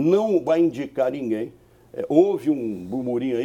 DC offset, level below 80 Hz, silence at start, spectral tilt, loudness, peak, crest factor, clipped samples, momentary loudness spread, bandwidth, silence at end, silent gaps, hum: under 0.1%; -62 dBFS; 0 s; -8 dB/octave; -22 LUFS; -4 dBFS; 18 dB; under 0.1%; 10 LU; 9.4 kHz; 0 s; none; none